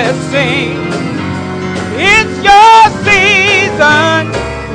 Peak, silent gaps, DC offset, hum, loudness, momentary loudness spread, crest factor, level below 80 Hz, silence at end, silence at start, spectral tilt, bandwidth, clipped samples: 0 dBFS; none; under 0.1%; none; -8 LUFS; 13 LU; 10 dB; -34 dBFS; 0 s; 0 s; -4 dB/octave; 11 kHz; 2%